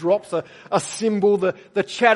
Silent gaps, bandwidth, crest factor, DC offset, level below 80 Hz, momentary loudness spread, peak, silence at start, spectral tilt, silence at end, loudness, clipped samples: none; 11.5 kHz; 20 dB; under 0.1%; -70 dBFS; 8 LU; 0 dBFS; 0 s; -4.5 dB/octave; 0 s; -22 LUFS; under 0.1%